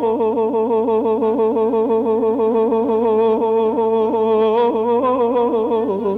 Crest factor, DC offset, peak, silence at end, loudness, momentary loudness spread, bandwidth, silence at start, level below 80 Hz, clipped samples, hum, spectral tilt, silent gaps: 8 dB; under 0.1%; -8 dBFS; 0 s; -17 LUFS; 2 LU; 4 kHz; 0 s; -58 dBFS; under 0.1%; none; -8.5 dB/octave; none